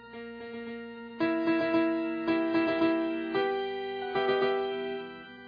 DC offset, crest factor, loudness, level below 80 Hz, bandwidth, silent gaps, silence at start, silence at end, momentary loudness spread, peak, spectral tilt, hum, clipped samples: under 0.1%; 14 dB; -30 LUFS; -68 dBFS; 5 kHz; none; 0 s; 0 s; 14 LU; -16 dBFS; -7.5 dB/octave; none; under 0.1%